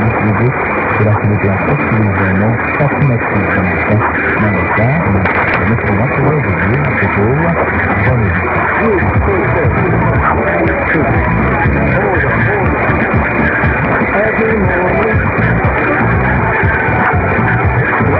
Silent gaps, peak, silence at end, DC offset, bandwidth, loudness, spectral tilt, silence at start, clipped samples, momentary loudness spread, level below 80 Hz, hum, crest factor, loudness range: none; 0 dBFS; 0 s; under 0.1%; 5.2 kHz; -12 LUFS; -11 dB/octave; 0 s; under 0.1%; 1 LU; -26 dBFS; none; 10 dB; 0 LU